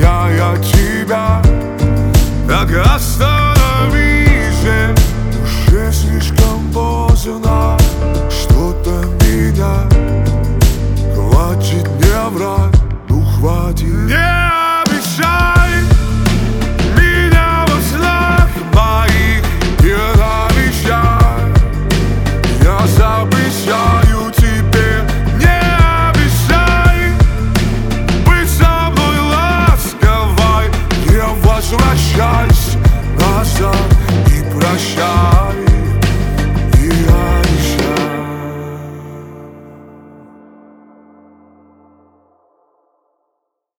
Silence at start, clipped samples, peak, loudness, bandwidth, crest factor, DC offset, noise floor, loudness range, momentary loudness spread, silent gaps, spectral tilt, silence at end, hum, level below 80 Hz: 0 s; under 0.1%; 0 dBFS; -12 LUFS; 19.5 kHz; 10 dB; under 0.1%; -72 dBFS; 2 LU; 5 LU; none; -5.5 dB/octave; 4.1 s; none; -14 dBFS